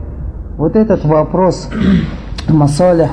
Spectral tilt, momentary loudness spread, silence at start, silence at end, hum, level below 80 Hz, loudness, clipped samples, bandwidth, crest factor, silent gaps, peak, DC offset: -7.5 dB/octave; 13 LU; 0 s; 0 s; none; -26 dBFS; -13 LUFS; under 0.1%; 10.5 kHz; 12 dB; none; 0 dBFS; under 0.1%